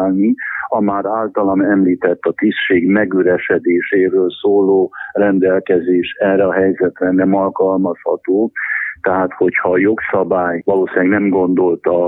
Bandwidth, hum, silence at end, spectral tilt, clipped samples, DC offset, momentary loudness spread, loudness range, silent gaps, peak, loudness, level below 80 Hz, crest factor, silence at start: 4 kHz; none; 0 s; -10 dB/octave; under 0.1%; under 0.1%; 4 LU; 2 LU; none; 0 dBFS; -15 LUFS; -56 dBFS; 14 dB; 0 s